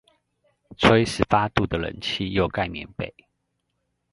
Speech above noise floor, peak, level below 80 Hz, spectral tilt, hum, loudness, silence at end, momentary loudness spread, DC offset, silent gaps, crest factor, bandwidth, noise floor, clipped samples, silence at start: 53 dB; 0 dBFS; -44 dBFS; -5.5 dB/octave; none; -23 LUFS; 1.05 s; 15 LU; under 0.1%; none; 24 dB; 11.5 kHz; -76 dBFS; under 0.1%; 0.7 s